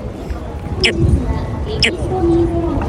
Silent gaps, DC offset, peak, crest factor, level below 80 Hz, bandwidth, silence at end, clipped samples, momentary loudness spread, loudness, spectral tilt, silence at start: none; under 0.1%; -2 dBFS; 16 dB; -24 dBFS; 11 kHz; 0 s; under 0.1%; 12 LU; -17 LUFS; -5.5 dB/octave; 0 s